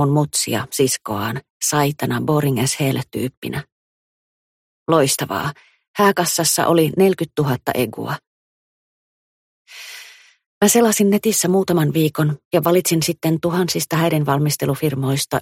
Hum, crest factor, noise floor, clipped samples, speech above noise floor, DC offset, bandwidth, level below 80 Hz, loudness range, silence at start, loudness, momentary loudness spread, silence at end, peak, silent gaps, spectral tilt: none; 18 dB; -43 dBFS; under 0.1%; 25 dB; under 0.1%; 16.5 kHz; -56 dBFS; 6 LU; 0 s; -18 LUFS; 12 LU; 0 s; -2 dBFS; 1.50-1.60 s, 3.37-3.42 s, 3.72-4.86 s, 5.88-5.94 s, 8.27-9.65 s, 10.46-10.61 s, 12.45-12.51 s; -4.5 dB/octave